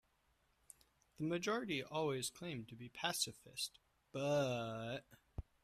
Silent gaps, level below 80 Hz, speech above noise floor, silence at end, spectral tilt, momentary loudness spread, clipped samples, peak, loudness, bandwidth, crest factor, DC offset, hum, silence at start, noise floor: none; -68 dBFS; 36 dB; 0.25 s; -4 dB/octave; 13 LU; under 0.1%; -24 dBFS; -42 LUFS; 14.5 kHz; 20 dB; under 0.1%; none; 1.2 s; -78 dBFS